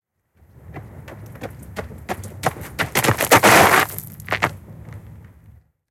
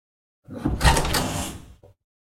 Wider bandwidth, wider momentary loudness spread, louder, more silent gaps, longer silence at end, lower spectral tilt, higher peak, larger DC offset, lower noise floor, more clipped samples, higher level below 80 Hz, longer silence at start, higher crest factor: about the same, 17 kHz vs 16.5 kHz; first, 28 LU vs 19 LU; first, -16 LUFS vs -23 LUFS; neither; first, 0.9 s vs 0.55 s; about the same, -3 dB/octave vs -4 dB/octave; first, 0 dBFS vs -4 dBFS; neither; first, -56 dBFS vs -45 dBFS; neither; second, -48 dBFS vs -30 dBFS; first, 0.7 s vs 0.5 s; about the same, 20 dB vs 22 dB